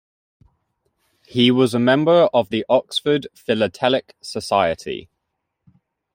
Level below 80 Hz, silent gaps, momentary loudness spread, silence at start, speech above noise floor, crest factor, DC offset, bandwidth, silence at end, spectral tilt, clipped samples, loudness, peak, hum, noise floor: -60 dBFS; none; 14 LU; 1.35 s; 59 dB; 18 dB; under 0.1%; 16 kHz; 1.15 s; -5.5 dB/octave; under 0.1%; -18 LUFS; -2 dBFS; none; -77 dBFS